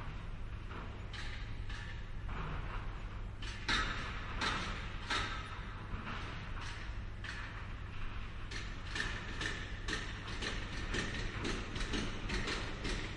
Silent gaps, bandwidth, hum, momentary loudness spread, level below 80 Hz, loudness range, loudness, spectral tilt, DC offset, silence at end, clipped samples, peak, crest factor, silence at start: none; 11 kHz; none; 9 LU; -44 dBFS; 6 LU; -41 LUFS; -4 dB/octave; under 0.1%; 0 s; under 0.1%; -20 dBFS; 20 dB; 0 s